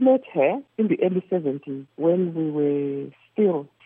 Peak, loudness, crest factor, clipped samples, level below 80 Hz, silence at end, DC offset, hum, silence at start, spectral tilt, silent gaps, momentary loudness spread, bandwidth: -8 dBFS; -24 LUFS; 14 dB; under 0.1%; -82 dBFS; 0.2 s; under 0.1%; none; 0 s; -11.5 dB/octave; none; 10 LU; 3.7 kHz